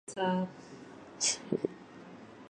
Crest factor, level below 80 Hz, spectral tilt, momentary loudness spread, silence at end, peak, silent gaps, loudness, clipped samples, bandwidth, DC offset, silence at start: 20 dB; -74 dBFS; -3.5 dB/octave; 20 LU; 0.05 s; -16 dBFS; none; -33 LUFS; under 0.1%; 11 kHz; under 0.1%; 0.1 s